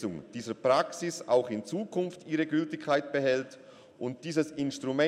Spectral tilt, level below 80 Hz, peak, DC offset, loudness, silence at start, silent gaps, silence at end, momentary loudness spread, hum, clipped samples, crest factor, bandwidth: -5 dB/octave; -74 dBFS; -14 dBFS; under 0.1%; -31 LUFS; 0 s; none; 0 s; 11 LU; none; under 0.1%; 18 dB; 13.5 kHz